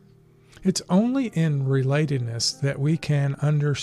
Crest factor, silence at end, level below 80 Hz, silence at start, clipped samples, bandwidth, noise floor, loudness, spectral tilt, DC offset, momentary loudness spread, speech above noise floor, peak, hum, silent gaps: 14 dB; 0 s; -58 dBFS; 0.6 s; under 0.1%; 12 kHz; -54 dBFS; -23 LUFS; -6 dB/octave; under 0.1%; 4 LU; 31 dB; -8 dBFS; none; none